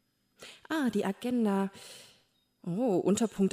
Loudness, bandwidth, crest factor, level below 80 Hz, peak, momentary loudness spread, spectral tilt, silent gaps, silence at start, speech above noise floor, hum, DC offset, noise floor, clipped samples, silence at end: -31 LUFS; 15.5 kHz; 14 dB; -70 dBFS; -16 dBFS; 22 LU; -6 dB/octave; none; 0.4 s; 40 dB; none; under 0.1%; -69 dBFS; under 0.1%; 0.05 s